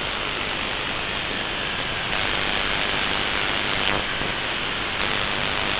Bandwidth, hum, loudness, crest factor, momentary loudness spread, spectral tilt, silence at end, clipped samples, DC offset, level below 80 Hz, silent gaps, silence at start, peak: 4 kHz; none; -23 LUFS; 20 dB; 3 LU; -0.5 dB/octave; 0 s; under 0.1%; under 0.1%; -42 dBFS; none; 0 s; -4 dBFS